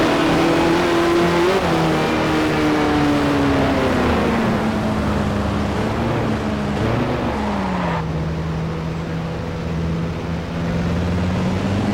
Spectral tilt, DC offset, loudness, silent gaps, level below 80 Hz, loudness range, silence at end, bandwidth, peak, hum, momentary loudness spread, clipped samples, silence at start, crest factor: -6.5 dB/octave; under 0.1%; -19 LUFS; none; -32 dBFS; 6 LU; 0 s; 18.5 kHz; -8 dBFS; none; 8 LU; under 0.1%; 0 s; 10 dB